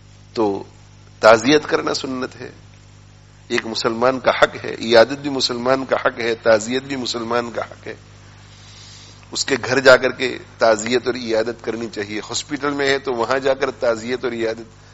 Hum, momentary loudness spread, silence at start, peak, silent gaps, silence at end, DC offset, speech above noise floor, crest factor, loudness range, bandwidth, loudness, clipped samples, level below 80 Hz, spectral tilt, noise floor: 50 Hz at -45 dBFS; 15 LU; 0.35 s; 0 dBFS; none; 0.25 s; under 0.1%; 26 dB; 20 dB; 4 LU; 8.2 kHz; -18 LUFS; under 0.1%; -52 dBFS; -3.5 dB/octave; -45 dBFS